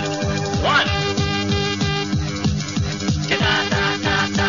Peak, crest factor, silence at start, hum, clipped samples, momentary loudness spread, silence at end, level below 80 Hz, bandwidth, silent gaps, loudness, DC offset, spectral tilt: -4 dBFS; 16 dB; 0 s; none; under 0.1%; 5 LU; 0 s; -36 dBFS; 7.4 kHz; none; -20 LUFS; 0.4%; -4.5 dB/octave